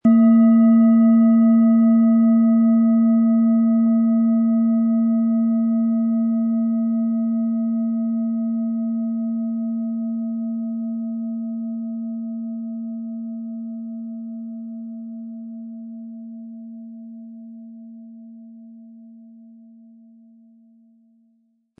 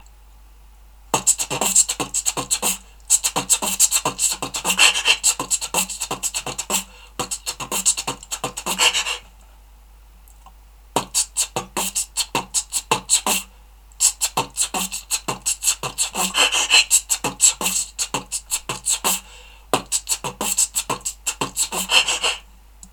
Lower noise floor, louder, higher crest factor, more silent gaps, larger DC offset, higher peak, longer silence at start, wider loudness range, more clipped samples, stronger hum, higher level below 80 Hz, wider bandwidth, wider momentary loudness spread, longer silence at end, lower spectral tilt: first, -64 dBFS vs -46 dBFS; about the same, -19 LUFS vs -19 LUFS; second, 14 dB vs 22 dB; neither; neither; second, -6 dBFS vs 0 dBFS; second, 0.05 s vs 1.1 s; first, 22 LU vs 6 LU; neither; neither; second, -76 dBFS vs -46 dBFS; second, 2.1 kHz vs over 20 kHz; first, 22 LU vs 10 LU; first, 2.65 s vs 0.05 s; first, -13 dB/octave vs 0 dB/octave